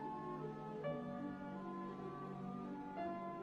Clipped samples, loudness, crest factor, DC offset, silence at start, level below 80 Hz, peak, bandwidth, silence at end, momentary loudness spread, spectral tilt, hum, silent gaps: under 0.1%; -47 LUFS; 14 dB; under 0.1%; 0 s; -74 dBFS; -32 dBFS; 8.8 kHz; 0 s; 3 LU; -8.5 dB/octave; none; none